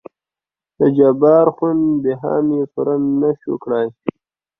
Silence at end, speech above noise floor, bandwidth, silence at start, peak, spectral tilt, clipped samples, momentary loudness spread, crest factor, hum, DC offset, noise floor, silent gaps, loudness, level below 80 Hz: 0.5 s; 74 dB; 3.8 kHz; 0.8 s; -2 dBFS; -12 dB/octave; under 0.1%; 10 LU; 16 dB; none; under 0.1%; -90 dBFS; none; -16 LUFS; -60 dBFS